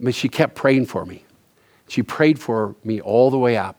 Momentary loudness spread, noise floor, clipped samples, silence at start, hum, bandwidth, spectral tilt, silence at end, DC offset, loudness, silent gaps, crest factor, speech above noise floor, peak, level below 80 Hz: 10 LU; -57 dBFS; under 0.1%; 0 s; none; 20 kHz; -6.5 dB/octave; 0.05 s; under 0.1%; -19 LUFS; none; 20 dB; 39 dB; 0 dBFS; -62 dBFS